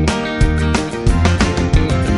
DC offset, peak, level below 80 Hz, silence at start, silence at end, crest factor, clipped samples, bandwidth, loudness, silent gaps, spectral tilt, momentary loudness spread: under 0.1%; -2 dBFS; -18 dBFS; 0 s; 0 s; 14 dB; under 0.1%; 11.5 kHz; -16 LUFS; none; -6 dB/octave; 3 LU